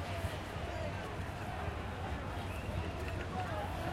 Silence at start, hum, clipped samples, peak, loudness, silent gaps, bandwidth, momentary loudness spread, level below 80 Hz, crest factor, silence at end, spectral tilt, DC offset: 0 s; none; under 0.1%; -26 dBFS; -40 LUFS; none; 16 kHz; 2 LU; -48 dBFS; 14 dB; 0 s; -6 dB/octave; under 0.1%